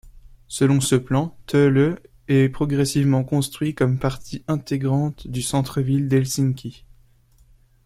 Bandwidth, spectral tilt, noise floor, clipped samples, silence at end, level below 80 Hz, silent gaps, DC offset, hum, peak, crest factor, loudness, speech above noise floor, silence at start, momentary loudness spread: 15.5 kHz; -6 dB/octave; -55 dBFS; under 0.1%; 1.15 s; -46 dBFS; none; under 0.1%; none; -4 dBFS; 18 dB; -21 LUFS; 35 dB; 0.05 s; 9 LU